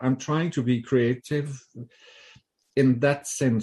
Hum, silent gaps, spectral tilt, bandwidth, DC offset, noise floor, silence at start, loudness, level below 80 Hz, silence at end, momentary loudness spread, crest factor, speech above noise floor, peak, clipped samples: none; none; -6 dB/octave; 12.5 kHz; under 0.1%; -57 dBFS; 0 s; -25 LUFS; -62 dBFS; 0 s; 20 LU; 18 dB; 32 dB; -6 dBFS; under 0.1%